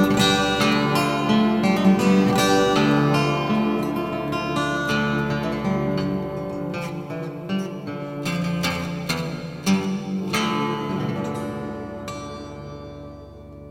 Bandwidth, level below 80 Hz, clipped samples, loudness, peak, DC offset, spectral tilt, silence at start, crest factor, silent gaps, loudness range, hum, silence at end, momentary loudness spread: 16.5 kHz; -48 dBFS; under 0.1%; -22 LUFS; -4 dBFS; under 0.1%; -5.5 dB/octave; 0 s; 18 dB; none; 8 LU; none; 0 s; 15 LU